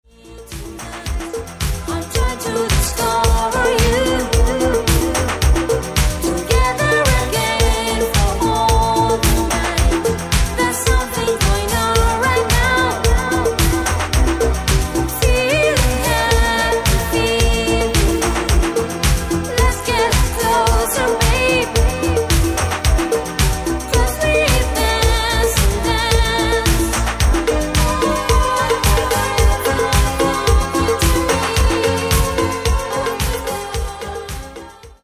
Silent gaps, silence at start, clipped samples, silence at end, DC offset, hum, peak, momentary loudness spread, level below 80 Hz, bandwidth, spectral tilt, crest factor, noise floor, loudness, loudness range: none; 0.25 s; under 0.1%; 0.15 s; under 0.1%; none; -2 dBFS; 6 LU; -20 dBFS; 16 kHz; -4 dB/octave; 14 dB; -37 dBFS; -16 LUFS; 1 LU